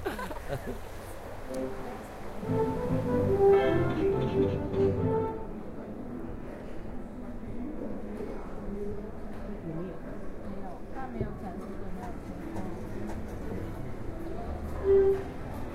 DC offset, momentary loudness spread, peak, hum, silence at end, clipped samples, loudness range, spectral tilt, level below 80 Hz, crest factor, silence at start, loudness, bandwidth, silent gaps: under 0.1%; 16 LU; -12 dBFS; none; 0 s; under 0.1%; 12 LU; -8 dB/octave; -42 dBFS; 18 dB; 0 s; -33 LUFS; 14.5 kHz; none